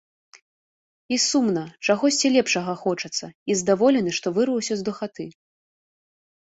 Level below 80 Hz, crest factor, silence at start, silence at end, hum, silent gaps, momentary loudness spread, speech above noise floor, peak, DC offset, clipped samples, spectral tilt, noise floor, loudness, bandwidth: -66 dBFS; 18 dB; 1.1 s; 1.2 s; none; 3.35-3.46 s; 11 LU; over 68 dB; -6 dBFS; under 0.1%; under 0.1%; -3.5 dB/octave; under -90 dBFS; -22 LUFS; 8.2 kHz